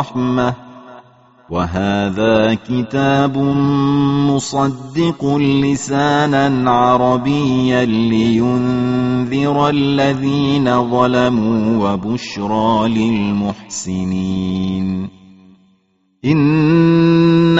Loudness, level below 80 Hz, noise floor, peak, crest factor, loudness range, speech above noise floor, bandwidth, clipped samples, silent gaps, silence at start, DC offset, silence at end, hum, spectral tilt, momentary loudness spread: -15 LUFS; -44 dBFS; -59 dBFS; 0 dBFS; 14 dB; 4 LU; 45 dB; 8 kHz; under 0.1%; none; 0 s; 0.3%; 0 s; none; -6 dB/octave; 8 LU